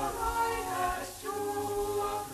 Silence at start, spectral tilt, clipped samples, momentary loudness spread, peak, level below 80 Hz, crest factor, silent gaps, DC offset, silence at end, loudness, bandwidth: 0 s; -3.5 dB/octave; under 0.1%; 5 LU; -18 dBFS; -48 dBFS; 14 dB; none; under 0.1%; 0 s; -33 LUFS; 14 kHz